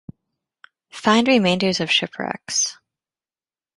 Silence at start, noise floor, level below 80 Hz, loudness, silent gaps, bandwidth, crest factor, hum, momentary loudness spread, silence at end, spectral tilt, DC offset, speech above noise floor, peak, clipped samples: 0.95 s; under -90 dBFS; -62 dBFS; -19 LUFS; none; 11.5 kHz; 20 dB; none; 12 LU; 1.05 s; -3 dB/octave; under 0.1%; over 71 dB; -2 dBFS; under 0.1%